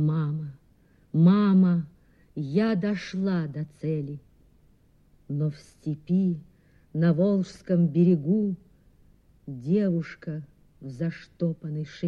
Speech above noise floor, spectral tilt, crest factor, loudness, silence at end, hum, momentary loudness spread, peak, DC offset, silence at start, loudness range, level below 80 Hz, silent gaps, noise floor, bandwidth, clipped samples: 35 dB; -9.5 dB/octave; 18 dB; -26 LUFS; 0 s; none; 17 LU; -8 dBFS; under 0.1%; 0 s; 7 LU; -62 dBFS; none; -60 dBFS; 6.6 kHz; under 0.1%